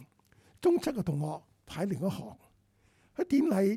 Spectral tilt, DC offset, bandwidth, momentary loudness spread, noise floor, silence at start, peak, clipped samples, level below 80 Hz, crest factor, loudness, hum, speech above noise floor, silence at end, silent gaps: -7.5 dB/octave; under 0.1%; 15.5 kHz; 17 LU; -67 dBFS; 0 s; -16 dBFS; under 0.1%; -64 dBFS; 16 dB; -31 LUFS; none; 38 dB; 0 s; none